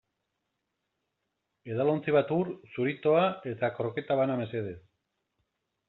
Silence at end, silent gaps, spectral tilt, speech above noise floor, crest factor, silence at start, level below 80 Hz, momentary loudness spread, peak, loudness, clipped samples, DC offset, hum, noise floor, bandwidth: 1.1 s; none; -5.5 dB/octave; 54 dB; 18 dB; 1.65 s; -72 dBFS; 11 LU; -12 dBFS; -29 LUFS; under 0.1%; under 0.1%; none; -82 dBFS; 4.2 kHz